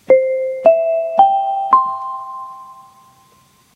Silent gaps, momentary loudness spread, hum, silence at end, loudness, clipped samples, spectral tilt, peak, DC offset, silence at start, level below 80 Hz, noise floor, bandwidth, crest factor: none; 18 LU; none; 0.95 s; -15 LUFS; under 0.1%; -5.5 dB/octave; 0 dBFS; under 0.1%; 0.1 s; -66 dBFS; -52 dBFS; 6.6 kHz; 16 dB